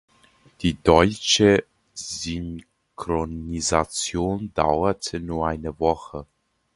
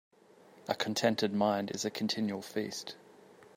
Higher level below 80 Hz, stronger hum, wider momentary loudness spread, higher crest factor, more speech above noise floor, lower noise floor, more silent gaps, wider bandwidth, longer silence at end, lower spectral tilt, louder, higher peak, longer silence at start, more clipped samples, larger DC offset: first, -40 dBFS vs -78 dBFS; neither; first, 18 LU vs 14 LU; about the same, 24 dB vs 20 dB; first, 35 dB vs 27 dB; about the same, -57 dBFS vs -60 dBFS; neither; second, 11.5 kHz vs 16 kHz; first, 0.5 s vs 0.1 s; about the same, -4 dB/octave vs -4 dB/octave; first, -23 LUFS vs -33 LUFS; first, 0 dBFS vs -14 dBFS; about the same, 0.6 s vs 0.55 s; neither; neither